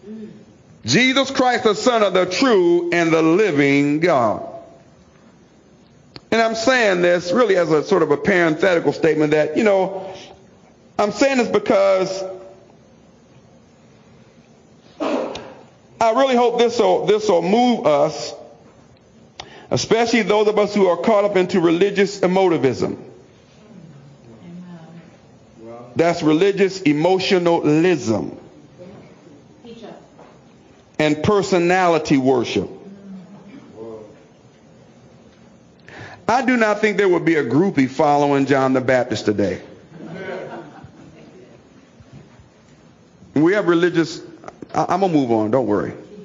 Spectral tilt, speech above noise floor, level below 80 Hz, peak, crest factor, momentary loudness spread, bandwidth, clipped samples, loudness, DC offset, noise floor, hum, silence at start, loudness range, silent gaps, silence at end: -5.5 dB/octave; 33 dB; -58 dBFS; -4 dBFS; 16 dB; 21 LU; 7.6 kHz; under 0.1%; -17 LUFS; under 0.1%; -50 dBFS; none; 0.05 s; 11 LU; none; 0 s